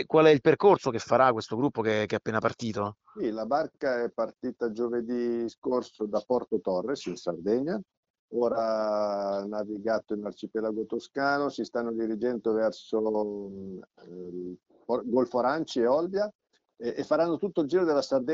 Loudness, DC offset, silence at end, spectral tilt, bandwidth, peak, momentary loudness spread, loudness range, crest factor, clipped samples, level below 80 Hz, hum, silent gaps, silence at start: -28 LUFS; under 0.1%; 0 s; -6 dB/octave; 7.8 kHz; -8 dBFS; 12 LU; 3 LU; 20 dB; under 0.1%; -68 dBFS; none; 5.58-5.62 s, 7.97-8.03 s, 8.10-8.28 s, 16.35-16.39 s; 0 s